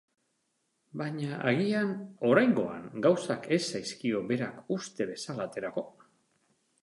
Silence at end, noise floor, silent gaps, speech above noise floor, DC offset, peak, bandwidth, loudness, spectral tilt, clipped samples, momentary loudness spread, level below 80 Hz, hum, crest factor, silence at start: 0.95 s; -77 dBFS; none; 47 dB; under 0.1%; -10 dBFS; 11.5 kHz; -30 LUFS; -5.5 dB/octave; under 0.1%; 11 LU; -74 dBFS; none; 22 dB; 0.95 s